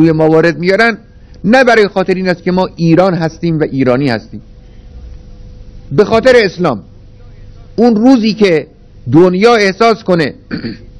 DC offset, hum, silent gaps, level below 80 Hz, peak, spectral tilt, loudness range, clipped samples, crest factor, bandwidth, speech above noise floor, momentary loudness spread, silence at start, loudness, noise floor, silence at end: under 0.1%; none; none; -36 dBFS; 0 dBFS; -6.5 dB/octave; 4 LU; 2%; 10 dB; 11 kHz; 25 dB; 12 LU; 0 s; -10 LUFS; -34 dBFS; 0.2 s